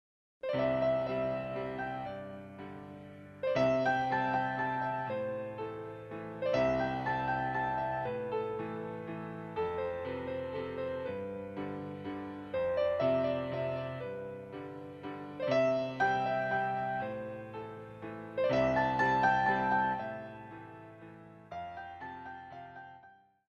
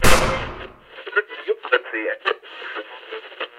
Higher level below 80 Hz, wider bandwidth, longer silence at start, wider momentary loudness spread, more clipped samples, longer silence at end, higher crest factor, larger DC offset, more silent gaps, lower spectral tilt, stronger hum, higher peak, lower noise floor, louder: second, -62 dBFS vs -32 dBFS; second, 6.8 kHz vs 16 kHz; first, 0.45 s vs 0 s; about the same, 17 LU vs 15 LU; neither; first, 0.35 s vs 0 s; about the same, 18 dB vs 20 dB; neither; neither; first, -7 dB/octave vs -3 dB/octave; neither; second, -16 dBFS vs 0 dBFS; first, -60 dBFS vs -38 dBFS; second, -34 LUFS vs -23 LUFS